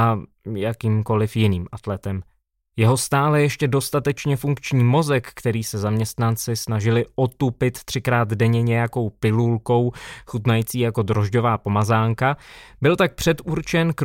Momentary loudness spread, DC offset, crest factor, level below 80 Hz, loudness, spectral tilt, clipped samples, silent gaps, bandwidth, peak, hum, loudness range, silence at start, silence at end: 8 LU; under 0.1%; 16 dB; -48 dBFS; -21 LUFS; -6 dB/octave; under 0.1%; none; 17 kHz; -6 dBFS; none; 2 LU; 0 s; 0 s